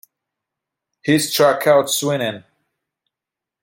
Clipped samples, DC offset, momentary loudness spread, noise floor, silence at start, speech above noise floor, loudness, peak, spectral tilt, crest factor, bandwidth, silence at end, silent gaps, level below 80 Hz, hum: under 0.1%; under 0.1%; 12 LU; -86 dBFS; 1.05 s; 70 dB; -17 LUFS; -2 dBFS; -3.5 dB/octave; 18 dB; 17 kHz; 1.25 s; none; -66 dBFS; none